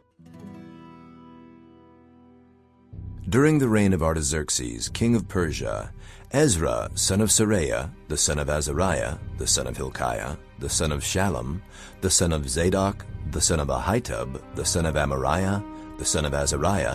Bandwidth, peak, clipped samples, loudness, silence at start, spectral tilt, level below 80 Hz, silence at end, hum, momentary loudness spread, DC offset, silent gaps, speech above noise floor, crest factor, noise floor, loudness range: 14.5 kHz; -6 dBFS; under 0.1%; -24 LUFS; 0.3 s; -4 dB/octave; -36 dBFS; 0 s; none; 14 LU; under 0.1%; none; 32 dB; 18 dB; -56 dBFS; 3 LU